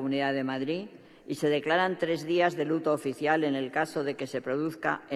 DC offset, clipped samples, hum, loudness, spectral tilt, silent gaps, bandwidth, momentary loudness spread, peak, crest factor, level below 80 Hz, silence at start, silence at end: under 0.1%; under 0.1%; none; -29 LUFS; -5.5 dB/octave; none; 14 kHz; 7 LU; -12 dBFS; 18 dB; -78 dBFS; 0 s; 0 s